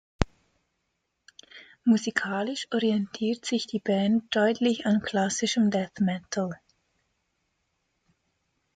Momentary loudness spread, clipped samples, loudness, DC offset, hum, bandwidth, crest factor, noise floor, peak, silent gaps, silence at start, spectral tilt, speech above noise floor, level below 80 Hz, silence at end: 8 LU; under 0.1%; -27 LUFS; under 0.1%; none; 9.2 kHz; 26 dB; -78 dBFS; -2 dBFS; none; 0.2 s; -5 dB/octave; 53 dB; -48 dBFS; 2.2 s